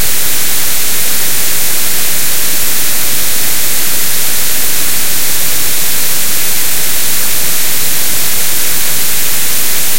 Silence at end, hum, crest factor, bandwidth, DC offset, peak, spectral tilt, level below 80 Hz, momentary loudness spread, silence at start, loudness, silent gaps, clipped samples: 0 s; none; 14 dB; over 20 kHz; 50%; 0 dBFS; -0.5 dB/octave; -38 dBFS; 0 LU; 0 s; -11 LUFS; none; 0.6%